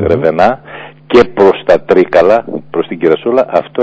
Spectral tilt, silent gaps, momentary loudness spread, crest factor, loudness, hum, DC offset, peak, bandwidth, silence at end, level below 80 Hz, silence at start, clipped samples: -7 dB/octave; none; 10 LU; 10 dB; -10 LUFS; none; under 0.1%; 0 dBFS; 8 kHz; 0 s; -40 dBFS; 0 s; 4%